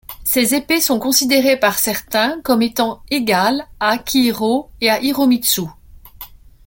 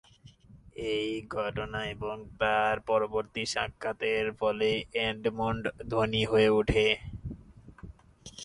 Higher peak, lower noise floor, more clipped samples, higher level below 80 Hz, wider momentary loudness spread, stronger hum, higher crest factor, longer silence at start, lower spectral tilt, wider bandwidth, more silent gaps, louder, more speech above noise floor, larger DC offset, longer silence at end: first, 0 dBFS vs -10 dBFS; second, -39 dBFS vs -56 dBFS; neither; about the same, -46 dBFS vs -50 dBFS; second, 6 LU vs 16 LU; neither; about the same, 18 dB vs 20 dB; second, 0.1 s vs 0.5 s; second, -2.5 dB/octave vs -5 dB/octave; first, 17 kHz vs 11 kHz; neither; first, -16 LUFS vs -29 LUFS; second, 22 dB vs 26 dB; neither; first, 0.4 s vs 0 s